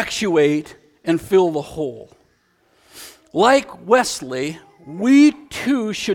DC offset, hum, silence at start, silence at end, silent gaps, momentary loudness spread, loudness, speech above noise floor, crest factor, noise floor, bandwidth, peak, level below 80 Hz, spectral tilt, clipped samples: under 0.1%; none; 0 s; 0 s; none; 17 LU; -18 LUFS; 43 dB; 18 dB; -61 dBFS; 16 kHz; 0 dBFS; -54 dBFS; -4.5 dB/octave; under 0.1%